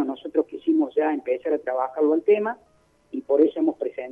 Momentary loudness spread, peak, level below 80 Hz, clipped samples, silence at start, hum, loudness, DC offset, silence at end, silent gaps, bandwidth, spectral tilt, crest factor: 10 LU; -6 dBFS; -70 dBFS; under 0.1%; 0 s; none; -23 LUFS; under 0.1%; 0 s; none; 3.7 kHz; -7.5 dB/octave; 16 dB